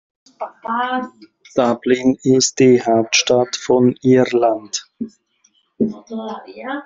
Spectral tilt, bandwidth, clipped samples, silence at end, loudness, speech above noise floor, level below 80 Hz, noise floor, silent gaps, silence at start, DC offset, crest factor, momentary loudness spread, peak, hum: -4 dB/octave; 7.8 kHz; under 0.1%; 0 s; -16 LUFS; 44 dB; -58 dBFS; -60 dBFS; none; 0.4 s; under 0.1%; 16 dB; 18 LU; 0 dBFS; none